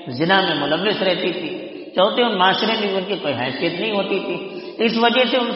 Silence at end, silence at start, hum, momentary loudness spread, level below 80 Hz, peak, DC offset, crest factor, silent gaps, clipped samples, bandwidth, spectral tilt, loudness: 0 s; 0 s; none; 11 LU; -64 dBFS; -2 dBFS; under 0.1%; 18 dB; none; under 0.1%; 6 kHz; -2 dB/octave; -19 LUFS